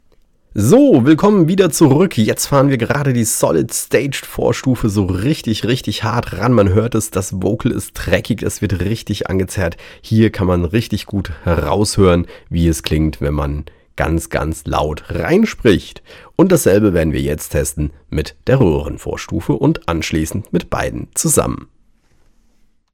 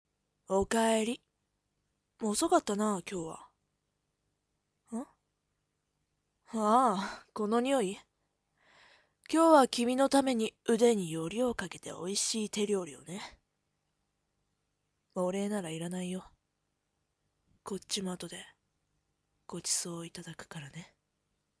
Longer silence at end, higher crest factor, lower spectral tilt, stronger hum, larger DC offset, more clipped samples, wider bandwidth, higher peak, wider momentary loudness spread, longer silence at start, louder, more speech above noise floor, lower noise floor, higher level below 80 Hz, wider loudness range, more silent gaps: first, 1.3 s vs 0.75 s; second, 14 dB vs 24 dB; first, -5.5 dB/octave vs -4 dB/octave; second, none vs 50 Hz at -65 dBFS; neither; neither; first, 18.5 kHz vs 11 kHz; first, 0 dBFS vs -10 dBFS; second, 10 LU vs 18 LU; about the same, 0.5 s vs 0.5 s; first, -16 LUFS vs -31 LUFS; second, 38 dB vs 51 dB; second, -53 dBFS vs -82 dBFS; first, -32 dBFS vs -68 dBFS; second, 5 LU vs 13 LU; neither